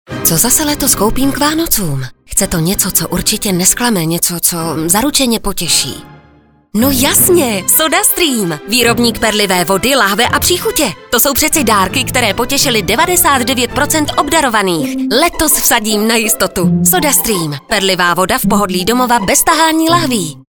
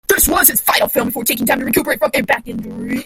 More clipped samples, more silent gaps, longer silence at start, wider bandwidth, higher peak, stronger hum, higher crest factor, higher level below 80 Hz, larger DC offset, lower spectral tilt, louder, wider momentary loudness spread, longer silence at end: neither; neither; about the same, 0.1 s vs 0.1 s; about the same, over 20 kHz vs over 20 kHz; about the same, 0 dBFS vs 0 dBFS; neither; about the same, 12 dB vs 16 dB; about the same, -34 dBFS vs -38 dBFS; neither; about the same, -2.5 dB/octave vs -2.5 dB/octave; first, -11 LUFS vs -14 LUFS; second, 5 LU vs 11 LU; about the same, 0.1 s vs 0 s